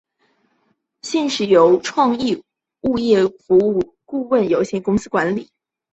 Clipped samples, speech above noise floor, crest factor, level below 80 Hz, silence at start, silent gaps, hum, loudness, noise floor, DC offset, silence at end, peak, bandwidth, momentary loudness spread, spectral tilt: under 0.1%; 50 dB; 16 dB; -54 dBFS; 1.05 s; none; none; -18 LUFS; -66 dBFS; under 0.1%; 0.5 s; -2 dBFS; 8.2 kHz; 12 LU; -5.5 dB/octave